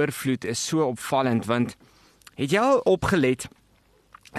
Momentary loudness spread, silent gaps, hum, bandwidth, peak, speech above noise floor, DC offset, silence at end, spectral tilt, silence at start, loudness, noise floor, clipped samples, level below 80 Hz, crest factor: 10 LU; none; none; 13 kHz; -10 dBFS; 38 dB; under 0.1%; 0 s; -5 dB/octave; 0 s; -24 LUFS; -61 dBFS; under 0.1%; -54 dBFS; 16 dB